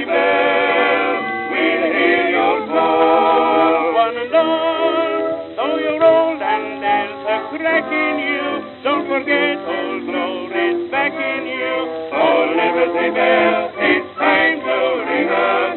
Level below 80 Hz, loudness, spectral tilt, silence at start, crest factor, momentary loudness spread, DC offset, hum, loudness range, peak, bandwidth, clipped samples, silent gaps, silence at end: -64 dBFS; -16 LUFS; -8 dB/octave; 0 s; 16 dB; 8 LU; under 0.1%; none; 4 LU; -2 dBFS; 4.3 kHz; under 0.1%; none; 0 s